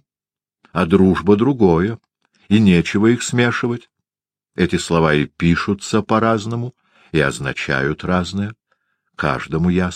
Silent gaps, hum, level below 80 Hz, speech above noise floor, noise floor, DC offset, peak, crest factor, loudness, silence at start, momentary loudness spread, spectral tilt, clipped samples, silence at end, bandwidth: none; none; -42 dBFS; over 74 dB; under -90 dBFS; under 0.1%; 0 dBFS; 16 dB; -17 LUFS; 0.75 s; 11 LU; -6 dB/octave; under 0.1%; 0 s; 10.5 kHz